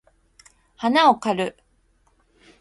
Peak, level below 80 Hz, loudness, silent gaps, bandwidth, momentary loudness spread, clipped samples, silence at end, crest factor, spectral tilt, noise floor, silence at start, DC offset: -4 dBFS; -62 dBFS; -20 LUFS; none; 11.5 kHz; 11 LU; under 0.1%; 1.1 s; 20 dB; -4.5 dB/octave; -63 dBFS; 0.8 s; under 0.1%